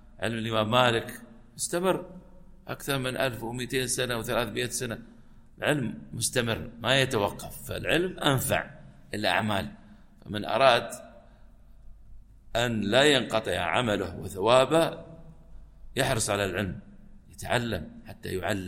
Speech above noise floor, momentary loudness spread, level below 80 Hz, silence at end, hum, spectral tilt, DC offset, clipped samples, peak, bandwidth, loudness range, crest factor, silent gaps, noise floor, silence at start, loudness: 24 dB; 17 LU; -50 dBFS; 0 s; none; -4 dB/octave; under 0.1%; under 0.1%; -6 dBFS; 16.5 kHz; 5 LU; 24 dB; none; -52 dBFS; 0.05 s; -27 LUFS